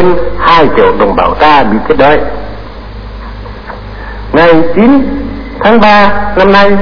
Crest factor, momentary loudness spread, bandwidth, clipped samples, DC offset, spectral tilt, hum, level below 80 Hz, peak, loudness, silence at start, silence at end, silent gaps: 8 dB; 20 LU; 5.4 kHz; 4%; 20%; -7 dB/octave; none; -24 dBFS; 0 dBFS; -6 LUFS; 0 s; 0 s; none